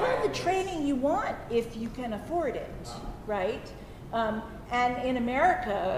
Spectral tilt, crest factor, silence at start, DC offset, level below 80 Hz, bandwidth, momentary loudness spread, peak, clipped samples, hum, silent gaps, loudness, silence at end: -5.5 dB/octave; 18 dB; 0 s; under 0.1%; -48 dBFS; 15.5 kHz; 14 LU; -12 dBFS; under 0.1%; none; none; -30 LUFS; 0 s